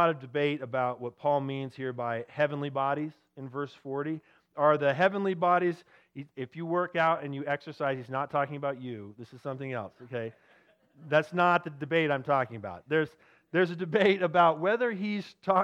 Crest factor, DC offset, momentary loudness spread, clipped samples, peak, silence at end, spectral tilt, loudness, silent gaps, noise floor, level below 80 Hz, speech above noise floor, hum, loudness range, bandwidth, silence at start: 20 dB; under 0.1%; 16 LU; under 0.1%; -10 dBFS; 0 s; -7.5 dB/octave; -29 LUFS; none; -64 dBFS; -78 dBFS; 34 dB; none; 6 LU; 9.2 kHz; 0 s